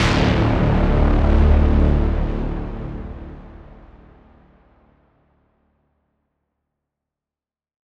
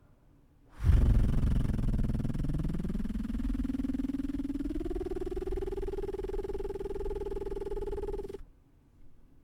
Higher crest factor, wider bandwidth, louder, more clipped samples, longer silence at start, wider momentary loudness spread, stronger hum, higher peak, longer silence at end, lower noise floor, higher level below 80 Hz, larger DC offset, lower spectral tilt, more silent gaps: about the same, 18 dB vs 18 dB; second, 8.2 kHz vs 11.5 kHz; first, -19 LUFS vs -34 LUFS; neither; second, 0 s vs 0.75 s; first, 19 LU vs 9 LU; neither; first, -2 dBFS vs -14 dBFS; first, 4.35 s vs 0.3 s; first, under -90 dBFS vs -61 dBFS; first, -22 dBFS vs -34 dBFS; neither; second, -7.5 dB/octave vs -9 dB/octave; neither